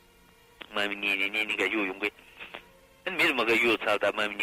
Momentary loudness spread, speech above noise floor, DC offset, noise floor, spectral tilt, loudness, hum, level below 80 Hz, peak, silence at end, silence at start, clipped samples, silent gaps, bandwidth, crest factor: 20 LU; 31 dB; under 0.1%; -58 dBFS; -3 dB/octave; -26 LUFS; none; -66 dBFS; -16 dBFS; 0 s; 0.6 s; under 0.1%; none; 16 kHz; 14 dB